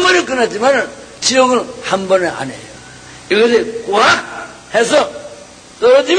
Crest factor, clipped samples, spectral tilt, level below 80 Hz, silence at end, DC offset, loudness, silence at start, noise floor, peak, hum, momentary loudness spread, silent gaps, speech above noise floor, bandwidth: 14 dB; under 0.1%; -2.5 dB/octave; -52 dBFS; 0 s; under 0.1%; -13 LUFS; 0 s; -36 dBFS; 0 dBFS; none; 20 LU; none; 23 dB; 9.8 kHz